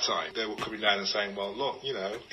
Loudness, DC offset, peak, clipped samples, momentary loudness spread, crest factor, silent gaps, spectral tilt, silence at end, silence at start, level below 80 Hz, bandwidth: -30 LUFS; under 0.1%; -10 dBFS; under 0.1%; 7 LU; 22 dB; none; -2 dB/octave; 0 s; 0 s; -66 dBFS; 15 kHz